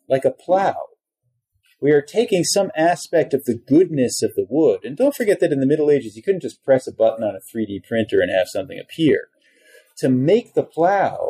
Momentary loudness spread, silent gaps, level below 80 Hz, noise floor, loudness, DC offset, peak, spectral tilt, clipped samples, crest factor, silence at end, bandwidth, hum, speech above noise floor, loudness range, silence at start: 8 LU; none; -64 dBFS; -73 dBFS; -19 LUFS; under 0.1%; -6 dBFS; -5 dB/octave; under 0.1%; 14 dB; 0 s; 15 kHz; none; 54 dB; 3 LU; 0.1 s